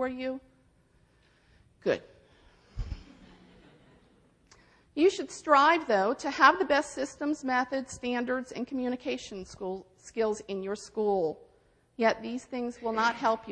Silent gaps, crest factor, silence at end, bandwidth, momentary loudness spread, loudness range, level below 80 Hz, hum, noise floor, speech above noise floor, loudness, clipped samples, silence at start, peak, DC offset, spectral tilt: none; 24 dB; 0 s; 10 kHz; 19 LU; 14 LU; -54 dBFS; none; -65 dBFS; 36 dB; -29 LUFS; under 0.1%; 0 s; -8 dBFS; under 0.1%; -4 dB/octave